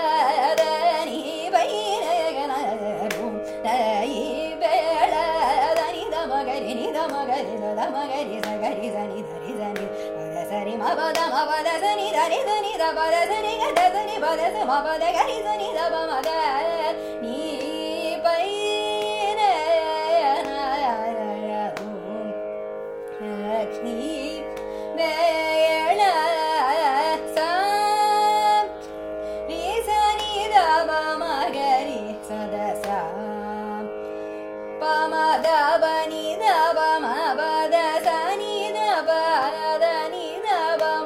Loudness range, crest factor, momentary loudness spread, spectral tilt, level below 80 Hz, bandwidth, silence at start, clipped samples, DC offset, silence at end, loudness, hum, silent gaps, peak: 6 LU; 20 dB; 11 LU; -3 dB/octave; -56 dBFS; 16 kHz; 0 s; under 0.1%; under 0.1%; 0 s; -23 LUFS; none; none; -4 dBFS